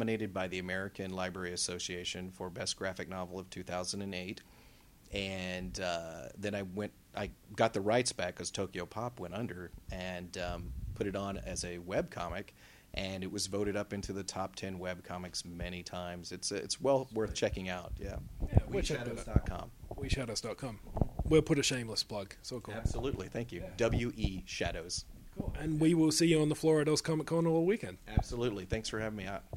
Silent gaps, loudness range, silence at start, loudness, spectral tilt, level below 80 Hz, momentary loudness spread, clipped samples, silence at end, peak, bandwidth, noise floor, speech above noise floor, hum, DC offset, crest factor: none; 9 LU; 0 s; -36 LUFS; -4.5 dB/octave; -46 dBFS; 13 LU; under 0.1%; 0 s; -8 dBFS; 16 kHz; -60 dBFS; 24 dB; none; under 0.1%; 28 dB